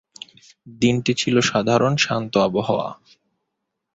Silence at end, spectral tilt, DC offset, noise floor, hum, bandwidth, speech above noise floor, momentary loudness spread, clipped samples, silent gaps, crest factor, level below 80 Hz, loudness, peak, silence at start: 1 s; -5 dB/octave; under 0.1%; -79 dBFS; none; 8 kHz; 59 dB; 17 LU; under 0.1%; none; 18 dB; -56 dBFS; -20 LUFS; -4 dBFS; 0.65 s